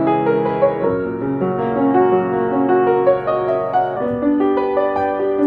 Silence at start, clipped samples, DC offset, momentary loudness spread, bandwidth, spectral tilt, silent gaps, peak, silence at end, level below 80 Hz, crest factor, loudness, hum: 0 s; under 0.1%; under 0.1%; 5 LU; 4.9 kHz; -10 dB/octave; none; -2 dBFS; 0 s; -50 dBFS; 14 dB; -17 LUFS; none